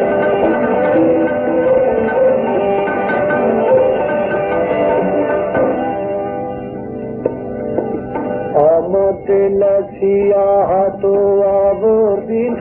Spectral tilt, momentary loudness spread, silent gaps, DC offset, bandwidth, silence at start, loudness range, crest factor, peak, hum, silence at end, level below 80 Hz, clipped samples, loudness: -11 dB/octave; 9 LU; none; under 0.1%; 3.9 kHz; 0 s; 5 LU; 14 dB; 0 dBFS; none; 0 s; -44 dBFS; under 0.1%; -15 LUFS